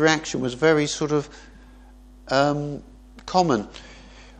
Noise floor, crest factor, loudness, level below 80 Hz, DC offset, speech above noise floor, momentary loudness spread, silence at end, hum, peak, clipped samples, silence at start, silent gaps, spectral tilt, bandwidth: -47 dBFS; 20 dB; -23 LUFS; -48 dBFS; under 0.1%; 25 dB; 20 LU; 0.1 s; none; -4 dBFS; under 0.1%; 0 s; none; -4.5 dB/octave; 9.8 kHz